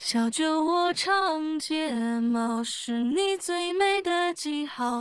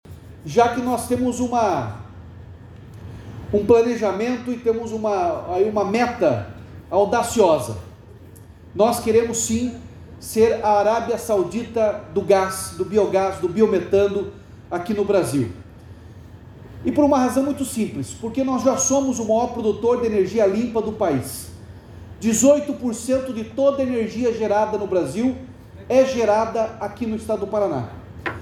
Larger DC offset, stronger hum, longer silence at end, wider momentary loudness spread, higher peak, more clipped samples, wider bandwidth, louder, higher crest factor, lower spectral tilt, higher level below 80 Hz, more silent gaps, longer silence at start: neither; neither; about the same, 0 s vs 0 s; second, 5 LU vs 18 LU; second, -12 dBFS vs -4 dBFS; neither; second, 12 kHz vs 16 kHz; second, -26 LUFS vs -21 LUFS; about the same, 16 dB vs 18 dB; second, -2.5 dB/octave vs -5 dB/octave; second, -70 dBFS vs -48 dBFS; neither; about the same, 0 s vs 0.05 s